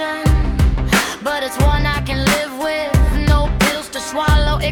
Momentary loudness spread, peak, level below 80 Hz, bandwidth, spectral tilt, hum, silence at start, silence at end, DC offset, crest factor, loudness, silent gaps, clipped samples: 5 LU; -2 dBFS; -20 dBFS; 18 kHz; -5 dB/octave; none; 0 s; 0 s; under 0.1%; 14 dB; -17 LUFS; none; under 0.1%